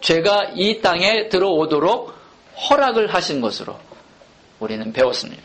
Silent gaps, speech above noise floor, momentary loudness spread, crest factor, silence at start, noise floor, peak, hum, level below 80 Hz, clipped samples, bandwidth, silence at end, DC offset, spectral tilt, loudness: none; 31 dB; 13 LU; 16 dB; 0 s; -49 dBFS; -2 dBFS; none; -54 dBFS; under 0.1%; 8.8 kHz; 0.05 s; under 0.1%; -4 dB/octave; -18 LUFS